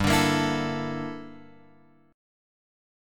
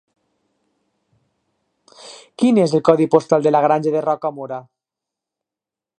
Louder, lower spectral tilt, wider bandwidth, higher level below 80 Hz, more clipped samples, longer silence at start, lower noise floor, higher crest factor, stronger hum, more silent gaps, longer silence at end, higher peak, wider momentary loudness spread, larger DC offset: second, -26 LUFS vs -16 LUFS; second, -4.5 dB/octave vs -7 dB/octave; first, 17.5 kHz vs 10 kHz; first, -48 dBFS vs -68 dBFS; neither; second, 0 s vs 2.05 s; second, -58 dBFS vs -88 dBFS; about the same, 20 dB vs 20 dB; first, 50 Hz at -70 dBFS vs none; neither; second, 0.95 s vs 1.4 s; second, -10 dBFS vs 0 dBFS; about the same, 19 LU vs 19 LU; neither